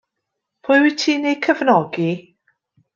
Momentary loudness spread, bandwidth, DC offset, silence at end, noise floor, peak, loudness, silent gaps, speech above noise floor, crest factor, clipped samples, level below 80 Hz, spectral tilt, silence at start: 10 LU; 7.6 kHz; under 0.1%; 0.75 s; -79 dBFS; -2 dBFS; -17 LUFS; none; 62 dB; 18 dB; under 0.1%; -70 dBFS; -5 dB/octave; 0.65 s